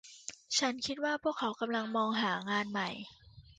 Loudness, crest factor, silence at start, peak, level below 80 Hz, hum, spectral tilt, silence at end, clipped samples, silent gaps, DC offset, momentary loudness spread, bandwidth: -34 LUFS; 20 dB; 0.05 s; -16 dBFS; -70 dBFS; none; -3 dB/octave; 0.2 s; under 0.1%; none; under 0.1%; 15 LU; 9.6 kHz